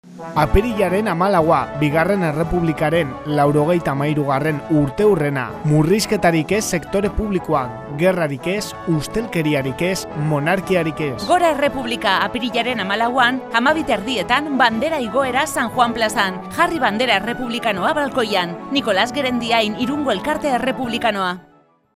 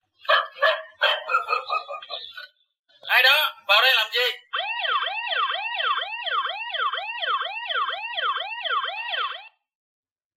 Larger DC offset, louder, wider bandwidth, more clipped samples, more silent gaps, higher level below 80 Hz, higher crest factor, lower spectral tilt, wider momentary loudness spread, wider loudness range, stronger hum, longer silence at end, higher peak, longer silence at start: neither; first, -18 LUFS vs -22 LUFS; about the same, 15.5 kHz vs 16 kHz; neither; second, none vs 2.79-2.84 s; first, -38 dBFS vs -84 dBFS; about the same, 18 dB vs 20 dB; first, -5 dB/octave vs 3 dB/octave; second, 5 LU vs 12 LU; second, 2 LU vs 6 LU; neither; second, 0.55 s vs 0.9 s; first, 0 dBFS vs -6 dBFS; second, 0.05 s vs 0.25 s